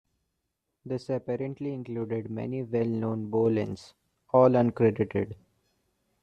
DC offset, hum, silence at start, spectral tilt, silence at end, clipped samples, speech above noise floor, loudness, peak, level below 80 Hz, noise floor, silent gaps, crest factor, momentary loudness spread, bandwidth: under 0.1%; none; 0.85 s; -9 dB/octave; 0.9 s; under 0.1%; 54 dB; -28 LUFS; -8 dBFS; -66 dBFS; -81 dBFS; none; 20 dB; 14 LU; 9.2 kHz